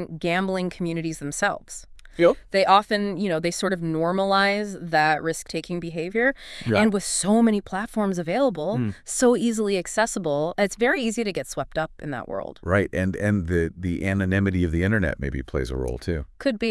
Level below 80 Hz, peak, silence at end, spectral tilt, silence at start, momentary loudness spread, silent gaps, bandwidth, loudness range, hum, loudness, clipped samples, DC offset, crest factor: -44 dBFS; -4 dBFS; 0 s; -5 dB/octave; 0 s; 10 LU; none; 12 kHz; 3 LU; none; -24 LUFS; under 0.1%; under 0.1%; 20 dB